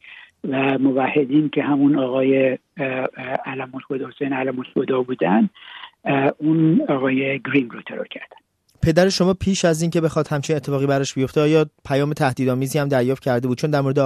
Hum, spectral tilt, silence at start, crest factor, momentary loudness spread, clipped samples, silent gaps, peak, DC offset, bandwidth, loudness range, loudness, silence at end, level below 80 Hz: none; -6 dB/octave; 0.05 s; 18 dB; 11 LU; under 0.1%; none; -2 dBFS; under 0.1%; 13.5 kHz; 3 LU; -20 LUFS; 0 s; -48 dBFS